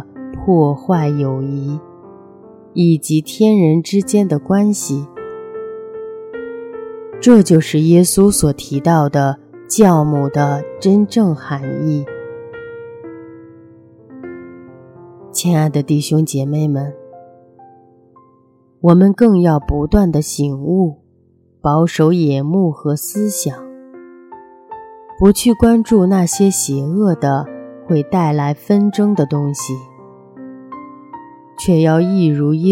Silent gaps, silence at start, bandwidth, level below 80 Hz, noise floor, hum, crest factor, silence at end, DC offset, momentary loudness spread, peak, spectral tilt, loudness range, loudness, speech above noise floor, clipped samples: none; 0 s; 16.5 kHz; -38 dBFS; -53 dBFS; none; 16 dB; 0 s; under 0.1%; 21 LU; 0 dBFS; -6.5 dB/octave; 6 LU; -14 LUFS; 40 dB; under 0.1%